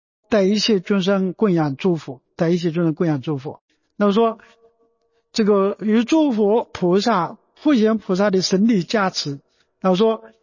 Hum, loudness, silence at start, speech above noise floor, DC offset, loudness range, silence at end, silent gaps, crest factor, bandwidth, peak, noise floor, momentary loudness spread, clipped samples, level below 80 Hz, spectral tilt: none; -19 LUFS; 0.3 s; 47 dB; under 0.1%; 4 LU; 0.15 s; 3.61-3.68 s; 14 dB; 7.4 kHz; -6 dBFS; -65 dBFS; 9 LU; under 0.1%; -62 dBFS; -6 dB/octave